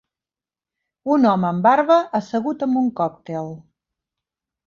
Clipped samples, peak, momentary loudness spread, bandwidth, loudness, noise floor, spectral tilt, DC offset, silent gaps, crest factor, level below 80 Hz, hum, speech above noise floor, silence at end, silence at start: under 0.1%; -2 dBFS; 14 LU; 7.2 kHz; -19 LUFS; under -90 dBFS; -7.5 dB/octave; under 0.1%; none; 18 dB; -64 dBFS; none; over 71 dB; 1.05 s; 1.05 s